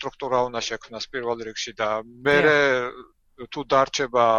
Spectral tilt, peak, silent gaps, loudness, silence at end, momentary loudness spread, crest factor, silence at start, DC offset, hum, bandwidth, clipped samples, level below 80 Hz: -3.5 dB/octave; -4 dBFS; none; -23 LUFS; 0 s; 15 LU; 20 dB; 0 s; under 0.1%; none; 7.6 kHz; under 0.1%; -54 dBFS